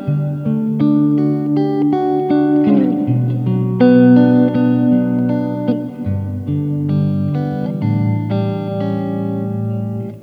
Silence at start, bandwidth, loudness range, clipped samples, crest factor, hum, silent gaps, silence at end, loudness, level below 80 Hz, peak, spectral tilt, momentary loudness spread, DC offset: 0 s; 5 kHz; 6 LU; under 0.1%; 14 dB; none; none; 0 s; -16 LUFS; -54 dBFS; 0 dBFS; -10.5 dB/octave; 9 LU; under 0.1%